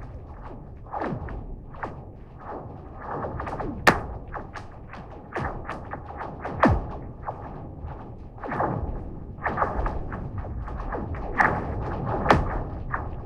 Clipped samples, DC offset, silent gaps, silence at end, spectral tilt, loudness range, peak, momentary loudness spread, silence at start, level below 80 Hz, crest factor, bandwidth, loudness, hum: under 0.1%; under 0.1%; none; 0 s; -6.5 dB/octave; 5 LU; -2 dBFS; 19 LU; 0 s; -36 dBFS; 26 dB; 15.5 kHz; -29 LUFS; none